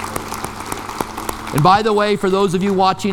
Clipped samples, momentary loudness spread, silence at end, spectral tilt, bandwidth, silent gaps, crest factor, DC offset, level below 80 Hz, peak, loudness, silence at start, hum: under 0.1%; 13 LU; 0 s; -5 dB/octave; 19 kHz; none; 16 dB; under 0.1%; -42 dBFS; 0 dBFS; -17 LUFS; 0 s; none